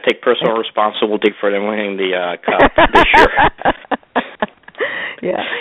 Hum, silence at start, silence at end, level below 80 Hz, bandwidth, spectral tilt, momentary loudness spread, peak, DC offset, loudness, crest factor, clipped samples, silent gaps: none; 0.05 s; 0 s; -32 dBFS; 12.5 kHz; -5.5 dB/octave; 13 LU; 0 dBFS; under 0.1%; -15 LUFS; 14 dB; 0.2%; none